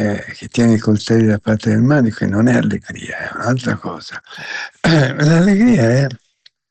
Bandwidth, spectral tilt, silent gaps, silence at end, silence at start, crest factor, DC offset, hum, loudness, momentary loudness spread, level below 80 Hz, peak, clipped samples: 8.8 kHz; -7 dB/octave; none; 0.55 s; 0 s; 10 dB; under 0.1%; none; -15 LUFS; 14 LU; -46 dBFS; -4 dBFS; under 0.1%